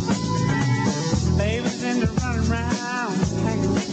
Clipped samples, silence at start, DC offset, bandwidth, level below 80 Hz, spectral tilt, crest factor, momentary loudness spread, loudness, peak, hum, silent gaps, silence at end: under 0.1%; 0 s; under 0.1%; 9 kHz; -36 dBFS; -5.5 dB/octave; 12 dB; 3 LU; -23 LUFS; -10 dBFS; none; none; 0 s